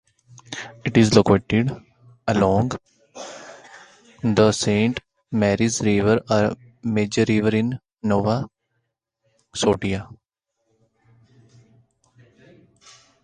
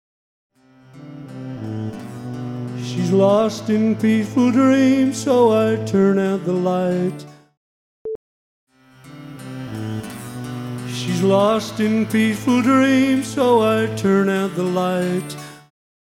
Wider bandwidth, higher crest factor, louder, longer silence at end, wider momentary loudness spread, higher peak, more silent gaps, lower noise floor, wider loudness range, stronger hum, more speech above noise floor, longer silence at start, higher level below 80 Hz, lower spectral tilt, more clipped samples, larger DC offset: second, 11 kHz vs 16 kHz; first, 22 dB vs 16 dB; second, -21 LUFS vs -18 LUFS; first, 3.1 s vs 0.55 s; about the same, 17 LU vs 18 LU; first, 0 dBFS vs -4 dBFS; second, none vs 7.57-8.05 s, 8.15-8.67 s; first, -77 dBFS vs -46 dBFS; second, 9 LU vs 13 LU; neither; first, 58 dB vs 30 dB; second, 0.5 s vs 0.95 s; first, -48 dBFS vs -58 dBFS; about the same, -5.5 dB/octave vs -6.5 dB/octave; neither; neither